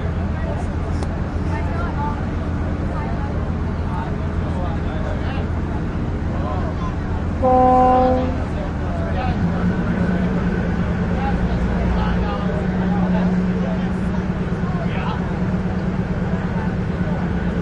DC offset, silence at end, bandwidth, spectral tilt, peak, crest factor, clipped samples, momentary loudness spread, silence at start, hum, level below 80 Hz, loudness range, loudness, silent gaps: under 0.1%; 0 s; 8.4 kHz; -8.5 dB/octave; -4 dBFS; 16 dB; under 0.1%; 6 LU; 0 s; none; -28 dBFS; 5 LU; -21 LUFS; none